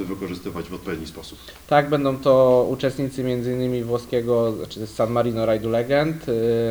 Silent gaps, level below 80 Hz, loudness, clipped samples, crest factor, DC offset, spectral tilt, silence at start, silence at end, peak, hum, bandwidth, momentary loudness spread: none; -50 dBFS; -22 LUFS; under 0.1%; 18 dB; under 0.1%; -7 dB/octave; 0 s; 0 s; -4 dBFS; none; over 20 kHz; 14 LU